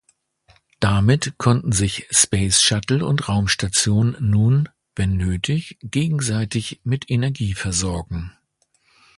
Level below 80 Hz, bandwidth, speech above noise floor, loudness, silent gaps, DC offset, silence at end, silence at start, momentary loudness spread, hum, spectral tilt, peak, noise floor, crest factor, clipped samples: -38 dBFS; 11.5 kHz; 46 dB; -19 LUFS; none; under 0.1%; 0.9 s; 0.8 s; 10 LU; none; -4 dB/octave; 0 dBFS; -65 dBFS; 20 dB; under 0.1%